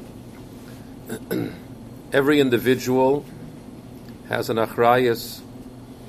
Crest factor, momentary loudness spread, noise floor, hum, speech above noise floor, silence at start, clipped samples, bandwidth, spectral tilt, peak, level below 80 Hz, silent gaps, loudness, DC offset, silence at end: 20 dB; 23 LU; -40 dBFS; none; 20 dB; 0 s; under 0.1%; 15.5 kHz; -5.5 dB/octave; -2 dBFS; -52 dBFS; none; -21 LUFS; under 0.1%; 0 s